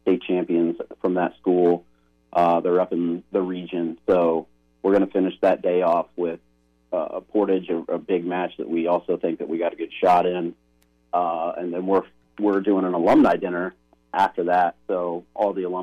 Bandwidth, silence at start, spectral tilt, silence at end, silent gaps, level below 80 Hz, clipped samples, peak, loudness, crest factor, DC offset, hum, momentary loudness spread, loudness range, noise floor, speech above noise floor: 8.6 kHz; 0.05 s; -8 dB/octave; 0 s; none; -62 dBFS; under 0.1%; -10 dBFS; -23 LUFS; 14 dB; under 0.1%; none; 9 LU; 3 LU; -62 dBFS; 41 dB